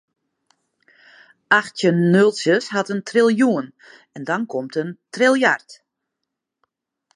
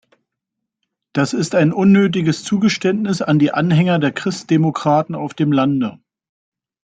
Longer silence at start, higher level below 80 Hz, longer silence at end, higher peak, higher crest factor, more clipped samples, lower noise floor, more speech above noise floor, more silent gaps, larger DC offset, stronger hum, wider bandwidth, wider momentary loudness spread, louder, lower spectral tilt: first, 1.5 s vs 1.15 s; second, -72 dBFS vs -58 dBFS; first, 1.4 s vs 0.9 s; about the same, 0 dBFS vs -2 dBFS; first, 20 dB vs 14 dB; neither; about the same, -81 dBFS vs -80 dBFS; about the same, 62 dB vs 64 dB; neither; neither; neither; first, 11 kHz vs 9.2 kHz; first, 11 LU vs 7 LU; about the same, -18 LUFS vs -16 LUFS; about the same, -5.5 dB/octave vs -6.5 dB/octave